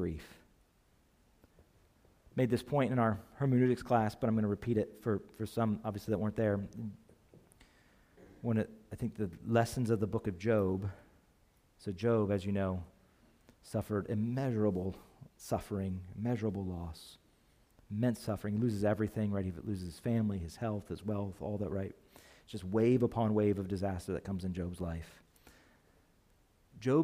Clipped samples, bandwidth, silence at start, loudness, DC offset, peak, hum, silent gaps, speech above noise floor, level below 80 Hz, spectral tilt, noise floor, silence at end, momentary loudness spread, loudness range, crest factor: under 0.1%; 15.5 kHz; 0 s; -35 LUFS; under 0.1%; -16 dBFS; none; none; 35 dB; -60 dBFS; -8 dB/octave; -69 dBFS; 0 s; 13 LU; 6 LU; 20 dB